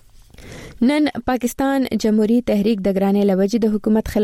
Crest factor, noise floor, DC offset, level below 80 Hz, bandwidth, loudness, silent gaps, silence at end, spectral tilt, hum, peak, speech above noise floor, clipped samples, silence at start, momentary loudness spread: 12 dB; -42 dBFS; under 0.1%; -42 dBFS; 16 kHz; -18 LUFS; none; 0 s; -6.5 dB/octave; none; -6 dBFS; 25 dB; under 0.1%; 0.4 s; 4 LU